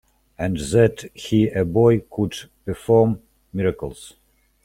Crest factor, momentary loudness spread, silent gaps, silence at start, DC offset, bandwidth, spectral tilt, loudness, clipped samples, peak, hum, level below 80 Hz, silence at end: 18 dB; 15 LU; none; 0.4 s; under 0.1%; 14 kHz; -7 dB/octave; -20 LUFS; under 0.1%; -4 dBFS; none; -46 dBFS; 0.55 s